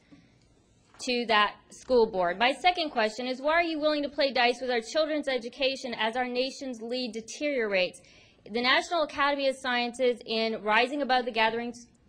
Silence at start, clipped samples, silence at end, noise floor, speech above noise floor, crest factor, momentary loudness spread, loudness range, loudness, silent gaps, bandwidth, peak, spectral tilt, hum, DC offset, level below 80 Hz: 0.1 s; under 0.1%; 0.25 s; -63 dBFS; 35 dB; 20 dB; 9 LU; 4 LU; -27 LUFS; none; 10.5 kHz; -10 dBFS; -3 dB/octave; none; under 0.1%; -62 dBFS